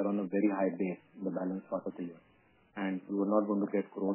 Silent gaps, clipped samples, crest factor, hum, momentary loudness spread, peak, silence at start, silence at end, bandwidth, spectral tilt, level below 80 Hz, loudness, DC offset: none; under 0.1%; 18 dB; none; 11 LU; -16 dBFS; 0 s; 0 s; 3.1 kHz; -8 dB/octave; -84 dBFS; -34 LUFS; under 0.1%